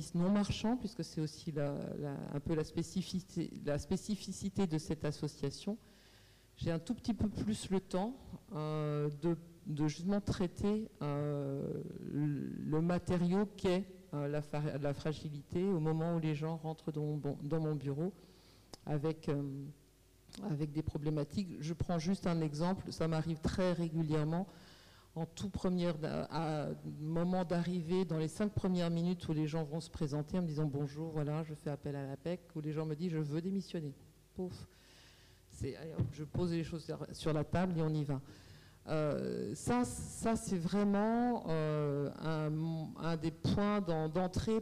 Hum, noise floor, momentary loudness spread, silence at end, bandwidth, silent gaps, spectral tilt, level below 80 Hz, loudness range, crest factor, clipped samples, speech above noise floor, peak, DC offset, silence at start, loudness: none; -65 dBFS; 8 LU; 0 s; 14.5 kHz; none; -7 dB/octave; -58 dBFS; 5 LU; 10 dB; under 0.1%; 29 dB; -28 dBFS; under 0.1%; 0 s; -38 LUFS